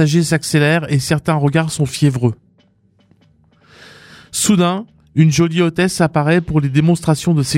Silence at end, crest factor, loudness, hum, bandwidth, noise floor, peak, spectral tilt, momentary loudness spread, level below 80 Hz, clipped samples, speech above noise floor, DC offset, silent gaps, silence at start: 0 s; 16 dB; -15 LUFS; none; 16 kHz; -55 dBFS; 0 dBFS; -5.5 dB/octave; 6 LU; -46 dBFS; under 0.1%; 41 dB; under 0.1%; none; 0 s